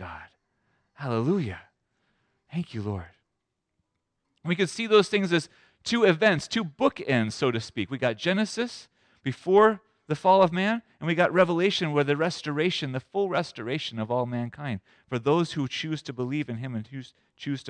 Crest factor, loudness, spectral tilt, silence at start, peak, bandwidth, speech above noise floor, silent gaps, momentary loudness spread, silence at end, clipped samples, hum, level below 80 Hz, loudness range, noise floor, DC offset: 18 dB; -26 LUFS; -5.5 dB/octave; 0 s; -8 dBFS; 10 kHz; 55 dB; none; 15 LU; 0 s; under 0.1%; none; -66 dBFS; 10 LU; -81 dBFS; under 0.1%